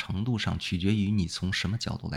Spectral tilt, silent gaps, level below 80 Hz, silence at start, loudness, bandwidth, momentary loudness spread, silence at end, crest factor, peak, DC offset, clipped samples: -5.5 dB/octave; none; -50 dBFS; 0 s; -29 LUFS; 13 kHz; 4 LU; 0 s; 14 dB; -14 dBFS; under 0.1%; under 0.1%